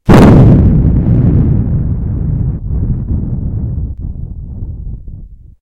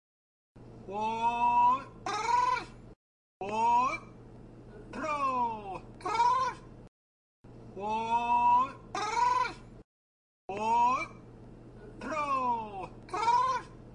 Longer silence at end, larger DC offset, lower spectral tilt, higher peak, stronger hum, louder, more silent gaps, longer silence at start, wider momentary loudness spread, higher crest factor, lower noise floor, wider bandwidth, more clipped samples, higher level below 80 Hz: first, 0.15 s vs 0 s; neither; first, -9 dB/octave vs -4 dB/octave; first, 0 dBFS vs -18 dBFS; neither; first, -11 LUFS vs -30 LUFS; second, none vs 2.96-3.40 s, 6.88-7.44 s, 9.84-10.48 s; second, 0.05 s vs 0.55 s; about the same, 20 LU vs 22 LU; about the same, 10 dB vs 14 dB; second, -30 dBFS vs -50 dBFS; about the same, 11.5 kHz vs 10.5 kHz; first, 2% vs under 0.1%; first, -16 dBFS vs -58 dBFS